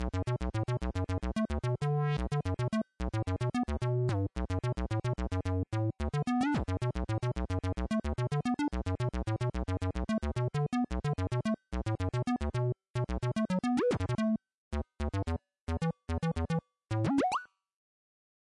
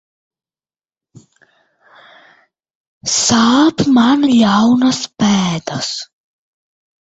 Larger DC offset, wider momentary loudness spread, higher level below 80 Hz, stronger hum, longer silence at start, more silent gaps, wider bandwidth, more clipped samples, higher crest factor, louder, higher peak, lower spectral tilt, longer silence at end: neither; second, 5 LU vs 11 LU; first, -42 dBFS vs -52 dBFS; neither; second, 0 s vs 3.05 s; first, 12.90-12.94 s, 14.55-14.71 s, 15.61-15.67 s vs none; first, 11.5 kHz vs 8.2 kHz; neither; about the same, 14 dB vs 16 dB; second, -34 LUFS vs -13 LUFS; second, -20 dBFS vs 0 dBFS; first, -7.5 dB/octave vs -4 dB/octave; first, 1.1 s vs 0.95 s